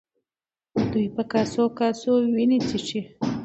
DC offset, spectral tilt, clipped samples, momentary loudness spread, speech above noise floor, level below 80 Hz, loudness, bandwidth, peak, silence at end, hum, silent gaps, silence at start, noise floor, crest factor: under 0.1%; -6 dB/octave; under 0.1%; 8 LU; over 67 dB; -56 dBFS; -24 LUFS; 8.2 kHz; -8 dBFS; 0 s; none; none; 0.75 s; under -90 dBFS; 16 dB